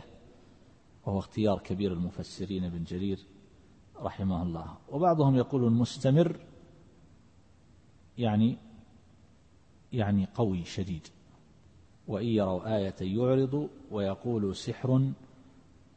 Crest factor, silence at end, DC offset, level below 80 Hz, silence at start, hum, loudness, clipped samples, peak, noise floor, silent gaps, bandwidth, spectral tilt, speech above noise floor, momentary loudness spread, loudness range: 18 dB; 0.8 s; under 0.1%; -58 dBFS; 0 s; none; -30 LUFS; under 0.1%; -12 dBFS; -61 dBFS; none; 8.8 kHz; -8 dB/octave; 32 dB; 13 LU; 6 LU